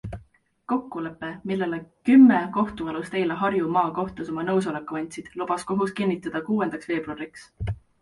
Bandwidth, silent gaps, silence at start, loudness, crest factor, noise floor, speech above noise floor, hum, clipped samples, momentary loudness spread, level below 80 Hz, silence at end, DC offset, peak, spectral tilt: 11.5 kHz; none; 0.05 s; -24 LUFS; 18 dB; -56 dBFS; 32 dB; none; under 0.1%; 16 LU; -50 dBFS; 0.25 s; under 0.1%; -6 dBFS; -7 dB/octave